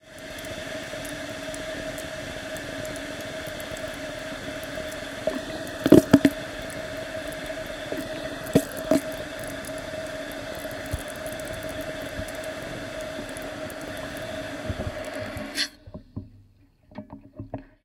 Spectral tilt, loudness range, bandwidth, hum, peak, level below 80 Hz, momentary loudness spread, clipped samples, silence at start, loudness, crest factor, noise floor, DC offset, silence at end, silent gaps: -5 dB/octave; 10 LU; 18 kHz; none; 0 dBFS; -48 dBFS; 10 LU; under 0.1%; 0.05 s; -29 LUFS; 30 dB; -57 dBFS; under 0.1%; 0.2 s; none